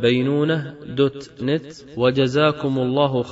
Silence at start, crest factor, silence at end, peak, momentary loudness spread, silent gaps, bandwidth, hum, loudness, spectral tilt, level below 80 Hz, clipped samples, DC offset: 0 s; 16 dB; 0 s; -4 dBFS; 8 LU; none; 8 kHz; none; -21 LUFS; -5 dB/octave; -54 dBFS; under 0.1%; under 0.1%